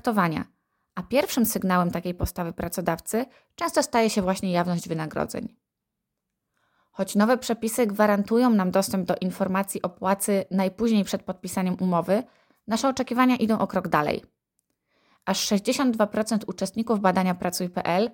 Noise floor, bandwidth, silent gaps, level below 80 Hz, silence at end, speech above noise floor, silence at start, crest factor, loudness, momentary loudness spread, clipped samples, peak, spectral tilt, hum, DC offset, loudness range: -83 dBFS; 17 kHz; none; -52 dBFS; 0 s; 59 dB; 0.05 s; 18 dB; -25 LUFS; 9 LU; under 0.1%; -6 dBFS; -5 dB/octave; none; under 0.1%; 4 LU